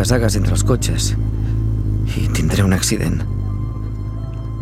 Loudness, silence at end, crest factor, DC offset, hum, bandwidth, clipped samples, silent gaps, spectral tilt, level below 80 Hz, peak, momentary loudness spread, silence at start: -19 LUFS; 0 s; 16 dB; under 0.1%; none; 15 kHz; under 0.1%; none; -5.5 dB/octave; -24 dBFS; 0 dBFS; 10 LU; 0 s